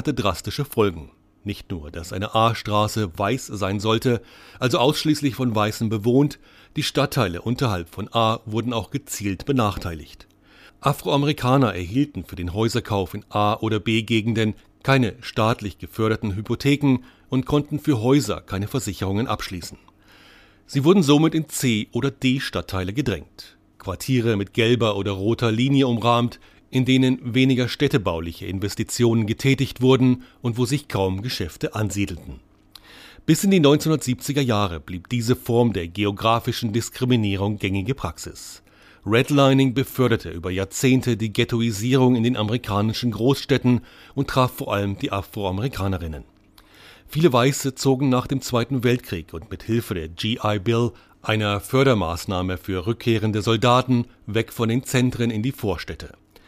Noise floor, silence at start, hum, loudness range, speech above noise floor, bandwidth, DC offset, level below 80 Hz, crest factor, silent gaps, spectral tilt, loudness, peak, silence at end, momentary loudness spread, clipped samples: -52 dBFS; 0 s; none; 4 LU; 30 dB; 15.5 kHz; under 0.1%; -46 dBFS; 18 dB; none; -6 dB/octave; -22 LUFS; -4 dBFS; 0.4 s; 11 LU; under 0.1%